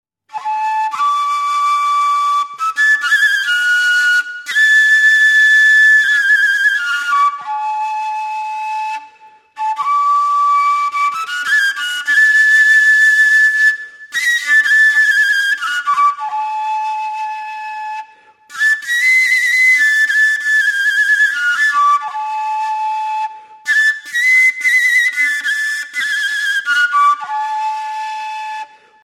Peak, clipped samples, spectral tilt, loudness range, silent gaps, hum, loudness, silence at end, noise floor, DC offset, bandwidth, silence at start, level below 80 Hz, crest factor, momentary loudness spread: -2 dBFS; under 0.1%; 4.5 dB/octave; 7 LU; none; none; -12 LUFS; 0.4 s; -44 dBFS; under 0.1%; 15.5 kHz; 0.35 s; -86 dBFS; 12 dB; 14 LU